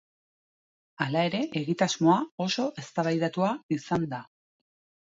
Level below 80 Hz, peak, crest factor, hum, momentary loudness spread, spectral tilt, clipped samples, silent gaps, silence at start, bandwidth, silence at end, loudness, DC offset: -70 dBFS; -10 dBFS; 20 dB; none; 8 LU; -5.5 dB/octave; under 0.1%; 2.32-2.38 s, 3.63-3.69 s; 1 s; 7.8 kHz; 0.85 s; -28 LUFS; under 0.1%